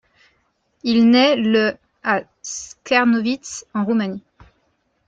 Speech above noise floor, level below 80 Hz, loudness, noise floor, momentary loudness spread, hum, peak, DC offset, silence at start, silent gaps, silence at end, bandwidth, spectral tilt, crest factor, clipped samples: 48 dB; -60 dBFS; -18 LUFS; -66 dBFS; 16 LU; none; -2 dBFS; under 0.1%; 0.85 s; none; 0.9 s; 7.8 kHz; -4 dB/octave; 18 dB; under 0.1%